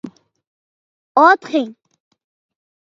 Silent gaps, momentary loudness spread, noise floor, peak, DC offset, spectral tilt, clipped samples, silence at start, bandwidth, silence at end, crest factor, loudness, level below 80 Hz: 0.47-1.15 s; 18 LU; under -90 dBFS; 0 dBFS; under 0.1%; -4.5 dB/octave; under 0.1%; 0.05 s; 7.6 kHz; 1.25 s; 20 dB; -15 LUFS; -74 dBFS